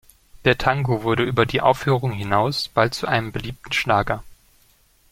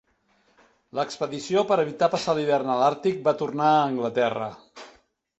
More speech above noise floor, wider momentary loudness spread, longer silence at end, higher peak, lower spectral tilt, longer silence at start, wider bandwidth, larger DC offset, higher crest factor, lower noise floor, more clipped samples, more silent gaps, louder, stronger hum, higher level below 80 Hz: second, 37 dB vs 42 dB; second, 6 LU vs 10 LU; first, 0.8 s vs 0.5 s; first, -2 dBFS vs -6 dBFS; about the same, -5.5 dB/octave vs -5.5 dB/octave; second, 0.4 s vs 0.95 s; first, 16 kHz vs 8.2 kHz; neither; about the same, 20 dB vs 20 dB; second, -58 dBFS vs -65 dBFS; neither; neither; first, -21 LUFS vs -24 LUFS; neither; first, -44 dBFS vs -68 dBFS